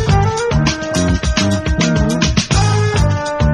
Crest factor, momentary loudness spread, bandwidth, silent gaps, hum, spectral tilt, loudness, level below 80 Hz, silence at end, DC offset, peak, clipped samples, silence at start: 14 dB; 2 LU; 12 kHz; none; none; -5 dB/octave; -15 LUFS; -22 dBFS; 0 s; under 0.1%; 0 dBFS; under 0.1%; 0 s